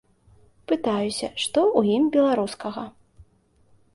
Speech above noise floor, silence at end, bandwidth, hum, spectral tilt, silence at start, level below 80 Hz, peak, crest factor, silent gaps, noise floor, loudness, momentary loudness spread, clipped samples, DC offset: 38 dB; 0.7 s; 11.5 kHz; none; -5 dB/octave; 0.7 s; -60 dBFS; -6 dBFS; 20 dB; none; -60 dBFS; -23 LUFS; 13 LU; under 0.1%; under 0.1%